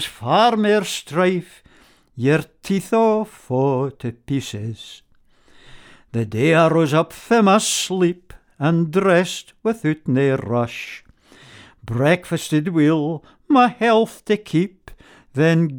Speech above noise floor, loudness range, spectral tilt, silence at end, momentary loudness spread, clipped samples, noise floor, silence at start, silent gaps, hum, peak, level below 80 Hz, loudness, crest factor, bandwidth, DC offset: 35 dB; 5 LU; -5.5 dB/octave; 0 s; 14 LU; under 0.1%; -54 dBFS; 0 s; none; none; -2 dBFS; -54 dBFS; -19 LUFS; 18 dB; 18 kHz; under 0.1%